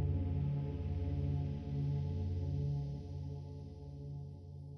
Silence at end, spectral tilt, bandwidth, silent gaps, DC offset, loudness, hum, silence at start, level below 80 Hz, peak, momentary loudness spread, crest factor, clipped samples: 0 s; -10 dB/octave; 6 kHz; none; under 0.1%; -40 LUFS; none; 0 s; -48 dBFS; -26 dBFS; 12 LU; 12 dB; under 0.1%